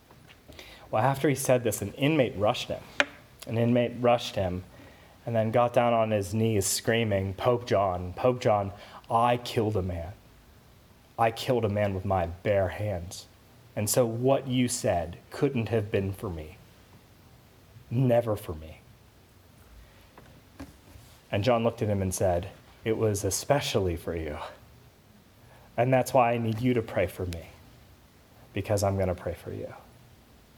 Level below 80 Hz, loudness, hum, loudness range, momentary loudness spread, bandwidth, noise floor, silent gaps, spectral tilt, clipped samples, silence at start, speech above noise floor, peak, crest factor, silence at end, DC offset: -54 dBFS; -28 LUFS; none; 6 LU; 15 LU; over 20 kHz; -57 dBFS; none; -5.5 dB/octave; under 0.1%; 0.5 s; 30 dB; -6 dBFS; 22 dB; 0.8 s; under 0.1%